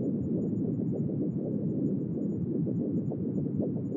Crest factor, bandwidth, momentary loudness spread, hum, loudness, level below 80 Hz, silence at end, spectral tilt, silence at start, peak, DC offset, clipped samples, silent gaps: 12 dB; 2.1 kHz; 2 LU; none; -31 LUFS; -62 dBFS; 0 s; -13.5 dB/octave; 0 s; -18 dBFS; under 0.1%; under 0.1%; none